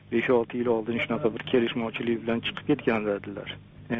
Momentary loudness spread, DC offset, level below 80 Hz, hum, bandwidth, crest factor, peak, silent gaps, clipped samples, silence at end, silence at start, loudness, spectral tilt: 10 LU; under 0.1%; -58 dBFS; none; 4.8 kHz; 16 dB; -10 dBFS; none; under 0.1%; 0 s; 0.05 s; -27 LUFS; -4 dB/octave